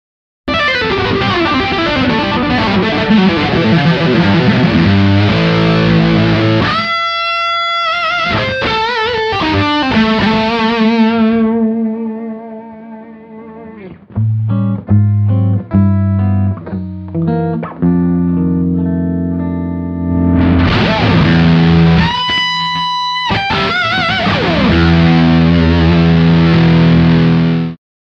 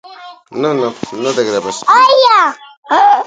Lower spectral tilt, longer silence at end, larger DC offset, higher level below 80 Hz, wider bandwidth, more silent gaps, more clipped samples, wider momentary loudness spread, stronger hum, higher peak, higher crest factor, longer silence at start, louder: first, -7.5 dB/octave vs -3 dB/octave; first, 0.3 s vs 0 s; neither; first, -30 dBFS vs -62 dBFS; second, 7 kHz vs 9.4 kHz; second, none vs 2.77-2.83 s; neither; second, 9 LU vs 12 LU; neither; about the same, 0 dBFS vs 0 dBFS; about the same, 12 dB vs 12 dB; first, 0.45 s vs 0.1 s; about the same, -12 LUFS vs -11 LUFS